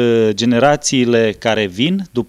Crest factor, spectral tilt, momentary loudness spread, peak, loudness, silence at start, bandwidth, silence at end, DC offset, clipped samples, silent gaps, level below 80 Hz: 14 dB; -4.5 dB/octave; 4 LU; 0 dBFS; -14 LUFS; 0 s; 13 kHz; 0.05 s; under 0.1%; under 0.1%; none; -50 dBFS